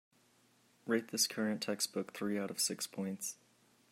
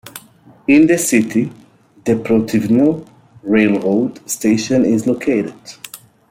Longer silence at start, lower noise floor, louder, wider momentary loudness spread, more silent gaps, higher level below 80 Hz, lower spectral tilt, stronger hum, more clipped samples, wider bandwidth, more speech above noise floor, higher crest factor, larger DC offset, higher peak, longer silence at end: first, 0.85 s vs 0.05 s; first, -70 dBFS vs -44 dBFS; second, -37 LUFS vs -15 LUFS; second, 10 LU vs 20 LU; neither; second, -86 dBFS vs -54 dBFS; second, -2.5 dB/octave vs -5.5 dB/octave; neither; neither; about the same, 16 kHz vs 16.5 kHz; about the same, 33 dB vs 30 dB; first, 20 dB vs 14 dB; neither; second, -20 dBFS vs -2 dBFS; first, 0.6 s vs 0.35 s